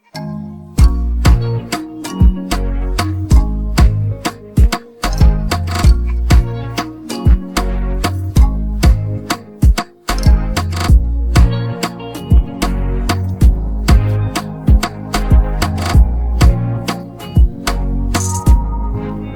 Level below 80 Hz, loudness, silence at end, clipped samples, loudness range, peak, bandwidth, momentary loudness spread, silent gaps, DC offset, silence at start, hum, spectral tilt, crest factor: -14 dBFS; -16 LUFS; 0 s; under 0.1%; 1 LU; 0 dBFS; 17 kHz; 8 LU; none; under 0.1%; 0.15 s; none; -6 dB/octave; 12 dB